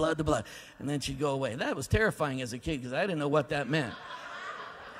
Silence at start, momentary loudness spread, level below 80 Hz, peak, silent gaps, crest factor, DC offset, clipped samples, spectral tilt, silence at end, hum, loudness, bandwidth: 0 s; 12 LU; -50 dBFS; -12 dBFS; none; 20 dB; under 0.1%; under 0.1%; -5.5 dB/octave; 0 s; none; -32 LUFS; 16 kHz